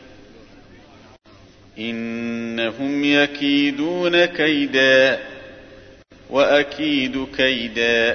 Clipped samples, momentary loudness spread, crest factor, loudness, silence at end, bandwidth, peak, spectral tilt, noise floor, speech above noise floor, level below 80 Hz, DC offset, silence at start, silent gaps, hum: under 0.1%; 11 LU; 18 dB; -18 LUFS; 0 s; 6.6 kHz; -4 dBFS; -4.5 dB/octave; -48 dBFS; 29 dB; -52 dBFS; under 0.1%; 0.1 s; none; none